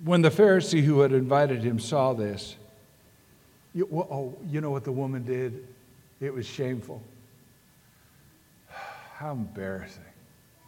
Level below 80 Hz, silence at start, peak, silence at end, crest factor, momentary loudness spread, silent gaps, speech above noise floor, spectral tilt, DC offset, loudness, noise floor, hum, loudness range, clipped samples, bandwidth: -66 dBFS; 0 s; -8 dBFS; 0.65 s; 20 dB; 21 LU; none; 34 dB; -6.5 dB/octave; under 0.1%; -26 LUFS; -59 dBFS; none; 16 LU; under 0.1%; 17 kHz